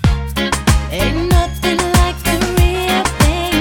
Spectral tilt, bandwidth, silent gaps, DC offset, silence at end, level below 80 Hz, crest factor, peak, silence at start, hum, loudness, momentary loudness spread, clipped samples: -4.5 dB/octave; 19 kHz; none; under 0.1%; 0 s; -18 dBFS; 14 dB; 0 dBFS; 0 s; none; -15 LUFS; 3 LU; under 0.1%